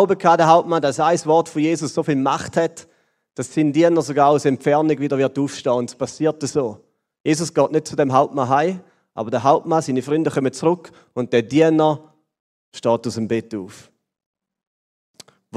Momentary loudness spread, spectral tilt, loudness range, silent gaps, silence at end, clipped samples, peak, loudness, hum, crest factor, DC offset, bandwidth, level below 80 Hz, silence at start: 12 LU; -6 dB/octave; 3 LU; 7.20-7.24 s, 12.40-12.72 s, 14.26-14.34 s, 14.67-15.14 s; 0 s; under 0.1%; 0 dBFS; -19 LUFS; none; 18 dB; under 0.1%; 12.5 kHz; -64 dBFS; 0 s